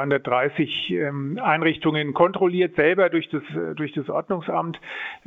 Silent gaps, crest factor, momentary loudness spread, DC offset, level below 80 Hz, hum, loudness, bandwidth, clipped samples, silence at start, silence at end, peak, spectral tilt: none; 20 dB; 9 LU; under 0.1%; -64 dBFS; none; -23 LUFS; 4.4 kHz; under 0.1%; 0 s; 0.1 s; -2 dBFS; -8 dB/octave